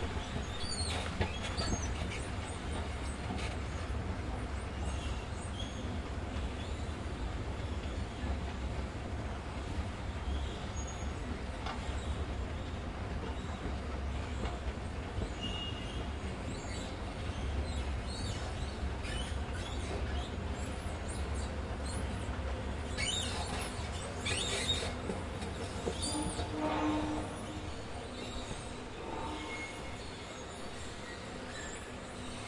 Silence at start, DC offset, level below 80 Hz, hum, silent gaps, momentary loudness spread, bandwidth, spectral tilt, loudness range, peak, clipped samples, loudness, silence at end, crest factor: 0 s; under 0.1%; -42 dBFS; none; none; 7 LU; 11.5 kHz; -4.5 dB/octave; 4 LU; -20 dBFS; under 0.1%; -39 LUFS; 0 s; 18 dB